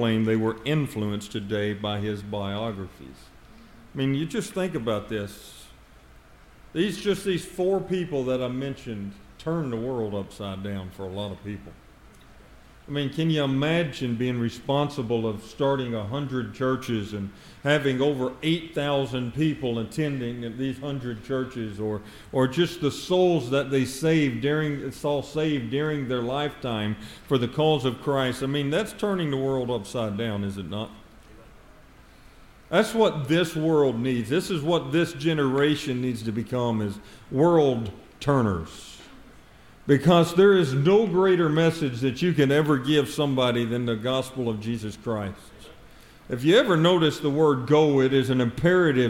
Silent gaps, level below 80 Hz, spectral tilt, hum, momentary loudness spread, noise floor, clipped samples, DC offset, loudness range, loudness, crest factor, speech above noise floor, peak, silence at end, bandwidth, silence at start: none; -54 dBFS; -6.5 dB/octave; none; 13 LU; -51 dBFS; under 0.1%; under 0.1%; 9 LU; -25 LUFS; 20 dB; 26 dB; -6 dBFS; 0 s; 16.5 kHz; 0 s